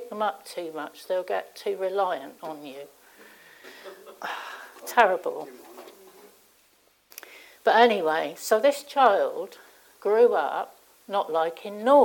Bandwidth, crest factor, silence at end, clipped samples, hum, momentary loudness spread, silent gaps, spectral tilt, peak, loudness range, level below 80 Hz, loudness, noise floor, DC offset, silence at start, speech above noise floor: 18 kHz; 20 dB; 0 s; under 0.1%; none; 24 LU; none; -3 dB/octave; -6 dBFS; 9 LU; -80 dBFS; -25 LUFS; -63 dBFS; under 0.1%; 0 s; 39 dB